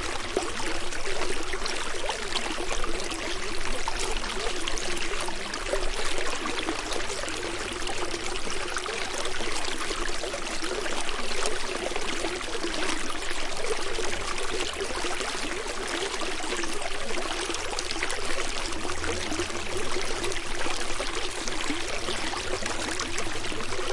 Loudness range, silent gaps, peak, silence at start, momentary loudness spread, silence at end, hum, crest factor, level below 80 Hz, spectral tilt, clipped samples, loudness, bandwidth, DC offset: 1 LU; none; -8 dBFS; 0 s; 2 LU; 0 s; none; 18 dB; -36 dBFS; -2 dB/octave; under 0.1%; -30 LUFS; 11.5 kHz; under 0.1%